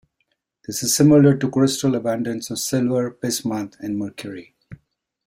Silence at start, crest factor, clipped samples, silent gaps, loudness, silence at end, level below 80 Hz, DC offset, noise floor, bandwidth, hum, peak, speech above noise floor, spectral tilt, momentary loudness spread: 0.7 s; 18 dB; under 0.1%; none; -20 LUFS; 0.5 s; -58 dBFS; under 0.1%; -72 dBFS; 16.5 kHz; none; -4 dBFS; 53 dB; -5 dB/octave; 16 LU